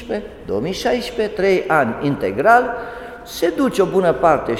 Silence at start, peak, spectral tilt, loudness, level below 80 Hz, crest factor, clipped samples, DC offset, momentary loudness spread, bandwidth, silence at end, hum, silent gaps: 0 s; 0 dBFS; -5.5 dB/octave; -18 LUFS; -44 dBFS; 18 dB; under 0.1%; under 0.1%; 13 LU; 16.5 kHz; 0 s; none; none